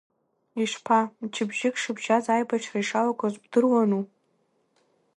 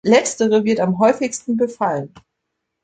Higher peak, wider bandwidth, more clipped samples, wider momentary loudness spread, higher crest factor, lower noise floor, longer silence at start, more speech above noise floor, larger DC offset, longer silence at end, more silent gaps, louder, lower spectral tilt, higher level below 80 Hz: second, -8 dBFS vs -2 dBFS; first, 11.5 kHz vs 9.4 kHz; neither; about the same, 8 LU vs 7 LU; about the same, 20 dB vs 16 dB; second, -70 dBFS vs -77 dBFS; first, 0.55 s vs 0.05 s; second, 45 dB vs 60 dB; neither; first, 1.1 s vs 0.65 s; neither; second, -25 LUFS vs -18 LUFS; about the same, -4.5 dB/octave vs -5 dB/octave; second, -78 dBFS vs -60 dBFS